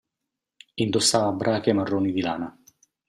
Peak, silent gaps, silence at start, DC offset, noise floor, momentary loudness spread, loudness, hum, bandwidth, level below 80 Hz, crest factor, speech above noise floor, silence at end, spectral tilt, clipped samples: -6 dBFS; none; 0.75 s; under 0.1%; -85 dBFS; 13 LU; -23 LUFS; none; 14 kHz; -64 dBFS; 20 dB; 62 dB; 0.6 s; -4 dB/octave; under 0.1%